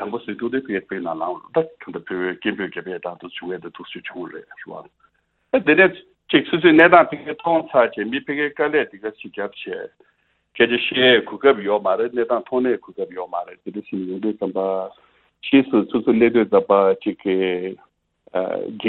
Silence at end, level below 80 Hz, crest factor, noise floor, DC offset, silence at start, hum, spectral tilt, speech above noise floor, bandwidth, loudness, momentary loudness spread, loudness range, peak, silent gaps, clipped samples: 0 s; -62 dBFS; 20 dB; -65 dBFS; under 0.1%; 0 s; none; -8.5 dB/octave; 45 dB; 4.3 kHz; -19 LUFS; 18 LU; 11 LU; 0 dBFS; none; under 0.1%